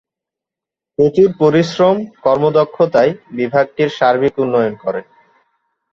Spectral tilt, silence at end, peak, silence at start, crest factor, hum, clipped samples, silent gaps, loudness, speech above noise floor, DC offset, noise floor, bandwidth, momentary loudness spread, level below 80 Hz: -7 dB/octave; 0.9 s; -2 dBFS; 1 s; 14 dB; none; under 0.1%; none; -14 LUFS; 72 dB; under 0.1%; -86 dBFS; 7.4 kHz; 9 LU; -54 dBFS